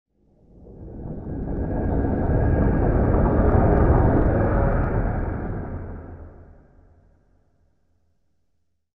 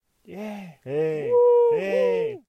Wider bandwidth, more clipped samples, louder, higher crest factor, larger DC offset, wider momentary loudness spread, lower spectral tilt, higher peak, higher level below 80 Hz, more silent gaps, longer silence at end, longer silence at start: second, 2.9 kHz vs 6.4 kHz; neither; about the same, -22 LUFS vs -21 LUFS; first, 18 dB vs 12 dB; neither; about the same, 19 LU vs 18 LU; first, -13 dB/octave vs -7 dB/octave; first, -6 dBFS vs -10 dBFS; first, -26 dBFS vs -72 dBFS; neither; first, 2.55 s vs 0.1 s; first, 0.6 s vs 0.3 s